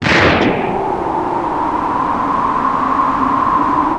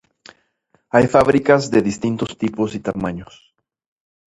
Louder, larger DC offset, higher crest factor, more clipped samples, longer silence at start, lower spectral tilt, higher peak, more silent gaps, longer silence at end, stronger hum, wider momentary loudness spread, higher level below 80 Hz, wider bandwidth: first, -15 LUFS vs -18 LUFS; neither; second, 14 dB vs 20 dB; neither; second, 0 s vs 0.95 s; about the same, -6 dB/octave vs -6.5 dB/octave; about the same, 0 dBFS vs 0 dBFS; neither; second, 0 s vs 1.1 s; neither; second, 6 LU vs 11 LU; first, -36 dBFS vs -48 dBFS; about the same, 11 kHz vs 11 kHz